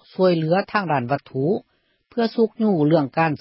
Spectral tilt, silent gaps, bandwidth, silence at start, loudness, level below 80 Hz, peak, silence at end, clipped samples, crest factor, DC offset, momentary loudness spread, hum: -12 dB/octave; none; 5.8 kHz; 0.2 s; -21 LUFS; -64 dBFS; -4 dBFS; 0.05 s; under 0.1%; 16 dB; under 0.1%; 7 LU; none